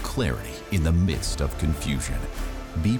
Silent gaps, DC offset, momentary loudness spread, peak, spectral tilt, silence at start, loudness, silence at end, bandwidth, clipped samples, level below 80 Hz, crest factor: none; under 0.1%; 10 LU; -14 dBFS; -5.5 dB/octave; 0 s; -27 LUFS; 0 s; 20 kHz; under 0.1%; -30 dBFS; 10 dB